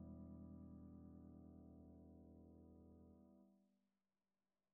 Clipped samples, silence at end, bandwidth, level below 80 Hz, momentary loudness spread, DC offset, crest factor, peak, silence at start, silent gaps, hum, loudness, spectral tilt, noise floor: under 0.1%; 0.95 s; 1.8 kHz; -72 dBFS; 8 LU; under 0.1%; 14 dB; -48 dBFS; 0 s; none; none; -63 LUFS; -9 dB/octave; under -90 dBFS